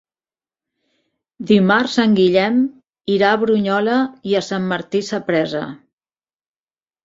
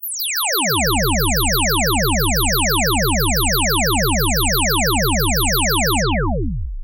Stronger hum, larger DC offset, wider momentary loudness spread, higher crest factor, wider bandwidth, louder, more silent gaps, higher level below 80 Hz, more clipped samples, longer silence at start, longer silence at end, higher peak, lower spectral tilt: neither; second, under 0.1% vs 0.4%; first, 10 LU vs 3 LU; first, 18 dB vs 12 dB; second, 7.8 kHz vs 16.5 kHz; about the same, -17 LUFS vs -16 LUFS; neither; second, -60 dBFS vs -24 dBFS; neither; first, 1.4 s vs 0 s; first, 1.3 s vs 0 s; first, -2 dBFS vs -6 dBFS; first, -6 dB/octave vs -3 dB/octave